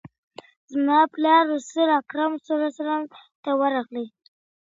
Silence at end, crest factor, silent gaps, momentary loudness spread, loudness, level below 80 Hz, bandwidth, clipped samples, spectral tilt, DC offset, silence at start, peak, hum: 0.7 s; 18 dB; 0.18-0.31 s, 0.56-0.68 s, 3.35-3.43 s; 15 LU; -22 LUFS; -78 dBFS; 7.8 kHz; under 0.1%; -4 dB/octave; under 0.1%; 0.05 s; -6 dBFS; none